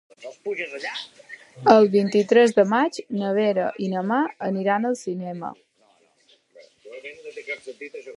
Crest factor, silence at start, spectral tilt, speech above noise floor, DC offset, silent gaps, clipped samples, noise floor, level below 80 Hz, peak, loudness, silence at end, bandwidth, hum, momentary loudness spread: 22 dB; 0.2 s; -6 dB/octave; 39 dB; under 0.1%; none; under 0.1%; -61 dBFS; -74 dBFS; 0 dBFS; -22 LUFS; 0 s; 11.5 kHz; none; 22 LU